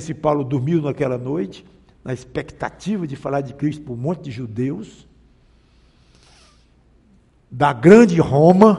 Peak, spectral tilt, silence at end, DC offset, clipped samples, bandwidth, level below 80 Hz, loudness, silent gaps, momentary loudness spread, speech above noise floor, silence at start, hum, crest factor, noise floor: 0 dBFS; -8 dB/octave; 0 s; under 0.1%; under 0.1%; 11 kHz; -50 dBFS; -18 LUFS; none; 20 LU; 37 dB; 0 s; none; 18 dB; -55 dBFS